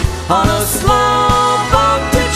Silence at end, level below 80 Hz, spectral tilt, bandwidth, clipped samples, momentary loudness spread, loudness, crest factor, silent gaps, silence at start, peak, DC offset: 0 s; -22 dBFS; -4 dB/octave; 16 kHz; under 0.1%; 2 LU; -12 LUFS; 12 dB; none; 0 s; 0 dBFS; under 0.1%